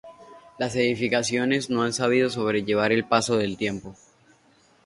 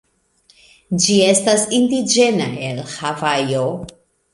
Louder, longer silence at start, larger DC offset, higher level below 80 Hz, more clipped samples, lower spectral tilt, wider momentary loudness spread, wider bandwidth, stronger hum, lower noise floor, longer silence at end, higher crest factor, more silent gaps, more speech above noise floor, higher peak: second, -24 LUFS vs -17 LUFS; second, 0.05 s vs 0.9 s; neither; second, -60 dBFS vs -54 dBFS; neither; about the same, -4.5 dB/octave vs -3.5 dB/octave; second, 7 LU vs 12 LU; about the same, 11.5 kHz vs 11.5 kHz; neither; about the same, -60 dBFS vs -57 dBFS; first, 0.95 s vs 0.45 s; about the same, 20 dB vs 16 dB; neither; second, 36 dB vs 40 dB; second, -6 dBFS vs -2 dBFS